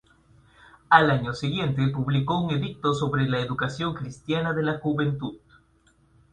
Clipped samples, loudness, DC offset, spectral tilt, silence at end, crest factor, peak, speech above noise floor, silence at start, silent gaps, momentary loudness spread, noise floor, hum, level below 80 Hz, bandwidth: under 0.1%; -25 LUFS; under 0.1%; -7 dB/octave; 0.95 s; 24 dB; 0 dBFS; 37 dB; 0.9 s; none; 10 LU; -62 dBFS; none; -54 dBFS; 9.4 kHz